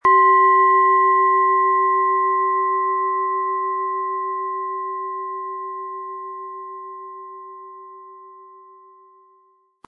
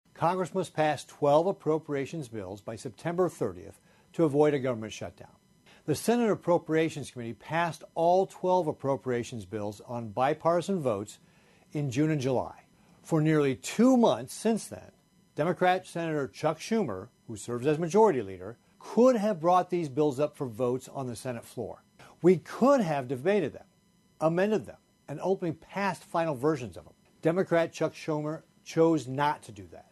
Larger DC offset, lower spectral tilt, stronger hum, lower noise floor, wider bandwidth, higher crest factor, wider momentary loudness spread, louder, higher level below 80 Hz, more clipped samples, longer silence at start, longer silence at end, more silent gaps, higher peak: neither; about the same, -6 dB/octave vs -6.5 dB/octave; neither; second, -59 dBFS vs -65 dBFS; second, 3.2 kHz vs 12.5 kHz; about the same, 14 dB vs 18 dB; first, 22 LU vs 15 LU; first, -18 LUFS vs -29 LUFS; about the same, -72 dBFS vs -68 dBFS; neither; second, 0.05 s vs 0.2 s; first, 1.4 s vs 0.1 s; neither; first, -6 dBFS vs -10 dBFS